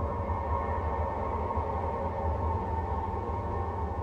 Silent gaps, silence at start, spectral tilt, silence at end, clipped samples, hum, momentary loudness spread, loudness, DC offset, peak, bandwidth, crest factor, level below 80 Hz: none; 0 s; -9.5 dB/octave; 0 s; under 0.1%; none; 2 LU; -32 LUFS; under 0.1%; -18 dBFS; 5.6 kHz; 12 dB; -38 dBFS